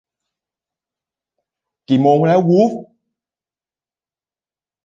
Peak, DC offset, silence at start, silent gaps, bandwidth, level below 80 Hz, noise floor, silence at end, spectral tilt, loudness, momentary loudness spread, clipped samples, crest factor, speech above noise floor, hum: -2 dBFS; under 0.1%; 1.9 s; none; 7.4 kHz; -66 dBFS; under -90 dBFS; 2 s; -8.5 dB/octave; -14 LUFS; 6 LU; under 0.1%; 18 dB; over 77 dB; none